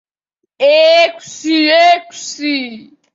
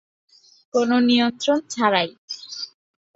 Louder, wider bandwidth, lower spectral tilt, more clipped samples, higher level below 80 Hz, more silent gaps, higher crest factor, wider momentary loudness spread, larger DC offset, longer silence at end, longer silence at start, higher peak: first, -11 LUFS vs -20 LUFS; about the same, 8 kHz vs 8 kHz; second, -1.5 dB/octave vs -3.5 dB/octave; neither; about the same, -68 dBFS vs -68 dBFS; second, none vs 2.18-2.28 s; second, 12 dB vs 20 dB; about the same, 15 LU vs 15 LU; neither; second, 0.35 s vs 0.5 s; second, 0.6 s vs 0.75 s; about the same, 0 dBFS vs -2 dBFS